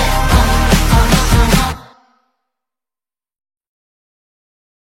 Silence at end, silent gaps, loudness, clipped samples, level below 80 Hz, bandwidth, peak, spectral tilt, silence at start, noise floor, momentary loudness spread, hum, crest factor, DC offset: 3.05 s; none; -12 LUFS; under 0.1%; -18 dBFS; 16.5 kHz; 0 dBFS; -4.5 dB/octave; 0 s; under -90 dBFS; 5 LU; none; 16 dB; under 0.1%